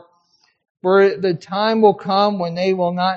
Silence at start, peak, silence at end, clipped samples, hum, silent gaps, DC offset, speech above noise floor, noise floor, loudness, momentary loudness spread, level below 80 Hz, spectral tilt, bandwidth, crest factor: 0.85 s; 0 dBFS; 0 s; under 0.1%; none; none; under 0.1%; 45 dB; -61 dBFS; -17 LUFS; 7 LU; -68 dBFS; -4 dB/octave; 7 kHz; 18 dB